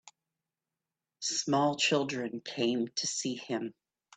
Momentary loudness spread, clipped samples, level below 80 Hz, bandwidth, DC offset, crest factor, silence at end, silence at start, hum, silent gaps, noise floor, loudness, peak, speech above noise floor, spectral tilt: 10 LU; under 0.1%; -80 dBFS; 9.4 kHz; under 0.1%; 18 dB; 0.45 s; 0.05 s; none; none; under -90 dBFS; -31 LUFS; -14 dBFS; over 58 dB; -3 dB/octave